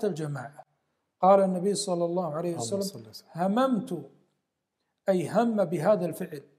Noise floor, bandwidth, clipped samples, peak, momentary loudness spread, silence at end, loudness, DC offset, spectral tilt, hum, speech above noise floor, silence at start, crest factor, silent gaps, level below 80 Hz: -81 dBFS; 15 kHz; under 0.1%; -8 dBFS; 16 LU; 0.15 s; -27 LUFS; under 0.1%; -6 dB/octave; none; 54 dB; 0 s; 20 dB; none; -82 dBFS